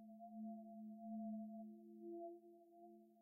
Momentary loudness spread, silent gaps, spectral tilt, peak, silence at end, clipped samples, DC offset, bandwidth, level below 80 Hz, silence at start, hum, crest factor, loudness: 15 LU; none; -11 dB/octave; -42 dBFS; 0 s; under 0.1%; under 0.1%; 0.8 kHz; under -90 dBFS; 0 s; none; 12 dB; -54 LUFS